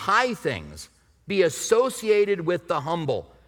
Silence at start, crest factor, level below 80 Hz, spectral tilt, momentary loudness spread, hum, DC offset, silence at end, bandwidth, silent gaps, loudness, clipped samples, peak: 0 s; 18 dB; -56 dBFS; -4 dB/octave; 9 LU; none; under 0.1%; 0.25 s; 18.5 kHz; none; -24 LUFS; under 0.1%; -6 dBFS